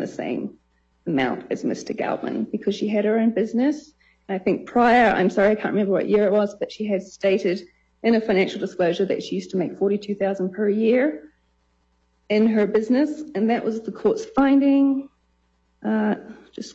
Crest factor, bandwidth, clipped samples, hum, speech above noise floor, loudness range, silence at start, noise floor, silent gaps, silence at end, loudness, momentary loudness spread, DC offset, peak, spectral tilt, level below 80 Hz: 16 dB; 8 kHz; under 0.1%; none; 45 dB; 4 LU; 0 s; -66 dBFS; none; 0 s; -22 LUFS; 10 LU; under 0.1%; -6 dBFS; -6.5 dB/octave; -58 dBFS